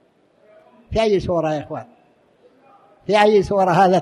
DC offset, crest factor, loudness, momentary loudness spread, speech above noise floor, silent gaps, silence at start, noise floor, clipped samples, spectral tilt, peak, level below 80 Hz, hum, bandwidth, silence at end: under 0.1%; 18 dB; -18 LUFS; 17 LU; 40 dB; none; 0.9 s; -56 dBFS; under 0.1%; -6 dB/octave; -2 dBFS; -44 dBFS; none; 12 kHz; 0 s